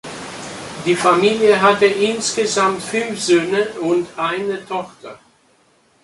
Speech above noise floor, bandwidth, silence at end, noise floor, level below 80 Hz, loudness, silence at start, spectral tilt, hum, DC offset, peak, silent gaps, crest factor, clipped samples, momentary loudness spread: 40 dB; 11.5 kHz; 0.9 s; -56 dBFS; -58 dBFS; -17 LUFS; 0.05 s; -3.5 dB/octave; none; under 0.1%; 0 dBFS; none; 18 dB; under 0.1%; 17 LU